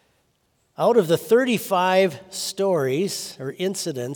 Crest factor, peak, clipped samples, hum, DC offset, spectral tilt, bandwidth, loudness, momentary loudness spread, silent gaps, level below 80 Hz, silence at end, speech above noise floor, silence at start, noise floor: 16 dB; -6 dBFS; under 0.1%; none; under 0.1%; -4.5 dB/octave; over 20 kHz; -22 LUFS; 10 LU; none; -72 dBFS; 0 s; 46 dB; 0.8 s; -67 dBFS